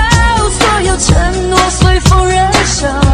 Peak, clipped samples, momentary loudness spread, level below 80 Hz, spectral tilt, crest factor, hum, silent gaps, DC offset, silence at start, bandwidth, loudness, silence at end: 0 dBFS; 0.4%; 2 LU; -16 dBFS; -4 dB/octave; 10 dB; none; none; under 0.1%; 0 s; 14.5 kHz; -10 LUFS; 0 s